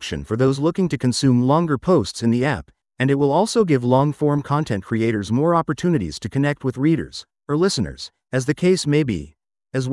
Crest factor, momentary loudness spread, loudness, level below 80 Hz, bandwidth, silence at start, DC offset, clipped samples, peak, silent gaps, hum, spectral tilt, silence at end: 18 dB; 8 LU; -20 LUFS; -48 dBFS; 12 kHz; 0 s; under 0.1%; under 0.1%; -2 dBFS; none; none; -6.5 dB/octave; 0 s